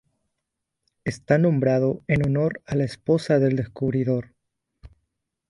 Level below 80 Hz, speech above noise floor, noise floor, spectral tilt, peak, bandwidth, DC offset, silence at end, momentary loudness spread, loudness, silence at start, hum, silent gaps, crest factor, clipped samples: -52 dBFS; 60 dB; -82 dBFS; -8 dB/octave; -4 dBFS; 11 kHz; under 0.1%; 0.65 s; 8 LU; -23 LUFS; 1.05 s; none; none; 20 dB; under 0.1%